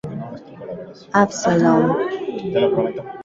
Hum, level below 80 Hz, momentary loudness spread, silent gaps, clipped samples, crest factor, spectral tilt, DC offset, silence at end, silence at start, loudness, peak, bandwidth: none; -56 dBFS; 19 LU; none; under 0.1%; 18 dB; -6 dB/octave; under 0.1%; 0 s; 0.05 s; -19 LUFS; -2 dBFS; 7.8 kHz